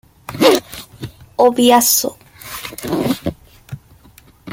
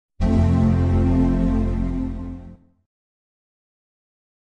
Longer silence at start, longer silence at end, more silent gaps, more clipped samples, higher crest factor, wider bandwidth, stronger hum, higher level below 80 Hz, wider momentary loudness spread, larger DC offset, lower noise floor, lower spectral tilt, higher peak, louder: about the same, 0.3 s vs 0.2 s; second, 0 s vs 2 s; neither; neither; about the same, 18 dB vs 16 dB; first, 17 kHz vs 7 kHz; neither; second, -48 dBFS vs -28 dBFS; first, 24 LU vs 14 LU; neither; first, -47 dBFS vs -42 dBFS; second, -3 dB/octave vs -9.5 dB/octave; first, 0 dBFS vs -6 dBFS; first, -14 LUFS vs -20 LUFS